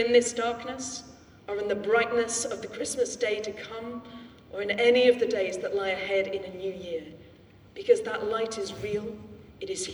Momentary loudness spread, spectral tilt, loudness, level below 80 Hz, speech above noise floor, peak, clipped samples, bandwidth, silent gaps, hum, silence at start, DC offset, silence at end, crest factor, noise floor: 18 LU; -2.5 dB/octave; -28 LUFS; -62 dBFS; 26 dB; -8 dBFS; under 0.1%; 12 kHz; none; none; 0 s; under 0.1%; 0 s; 20 dB; -53 dBFS